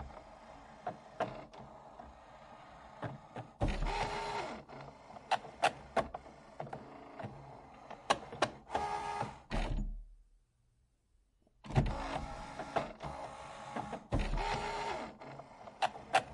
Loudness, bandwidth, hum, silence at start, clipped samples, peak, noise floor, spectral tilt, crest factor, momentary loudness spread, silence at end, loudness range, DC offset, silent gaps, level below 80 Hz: -40 LUFS; 11.5 kHz; none; 0 s; under 0.1%; -14 dBFS; -74 dBFS; -5 dB/octave; 26 dB; 19 LU; 0 s; 4 LU; under 0.1%; none; -48 dBFS